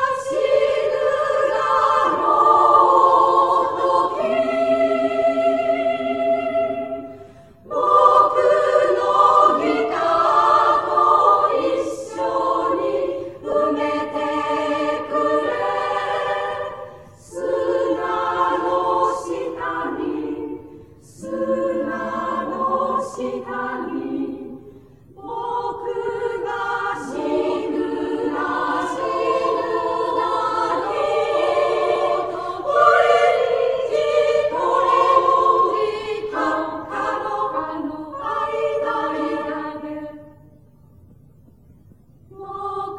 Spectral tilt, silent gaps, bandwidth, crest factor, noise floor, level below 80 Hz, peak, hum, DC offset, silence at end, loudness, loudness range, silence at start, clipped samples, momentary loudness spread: -4.5 dB/octave; none; 11.5 kHz; 18 dB; -50 dBFS; -58 dBFS; -2 dBFS; none; 0.1%; 0 s; -19 LUFS; 10 LU; 0 s; under 0.1%; 13 LU